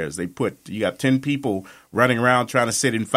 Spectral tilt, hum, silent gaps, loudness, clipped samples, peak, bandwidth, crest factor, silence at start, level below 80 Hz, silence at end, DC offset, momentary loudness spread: -4.5 dB/octave; none; none; -21 LUFS; under 0.1%; -2 dBFS; 16 kHz; 20 dB; 0 s; -58 dBFS; 0 s; under 0.1%; 10 LU